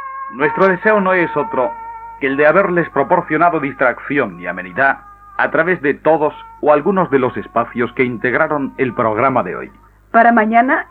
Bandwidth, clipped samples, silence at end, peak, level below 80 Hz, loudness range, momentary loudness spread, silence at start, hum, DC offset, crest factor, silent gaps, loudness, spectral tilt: 5 kHz; under 0.1%; 0.05 s; 0 dBFS; -50 dBFS; 2 LU; 10 LU; 0 s; none; under 0.1%; 16 dB; none; -15 LUFS; -9 dB/octave